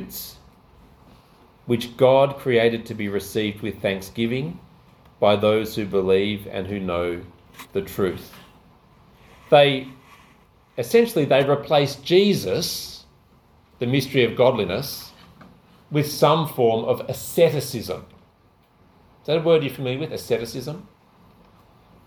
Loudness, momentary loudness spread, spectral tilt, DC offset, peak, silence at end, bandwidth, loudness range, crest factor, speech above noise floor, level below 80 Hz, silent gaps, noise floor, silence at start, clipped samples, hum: -21 LUFS; 16 LU; -5.5 dB/octave; under 0.1%; -2 dBFS; 1.25 s; 19 kHz; 5 LU; 20 dB; 37 dB; -54 dBFS; none; -58 dBFS; 0 s; under 0.1%; none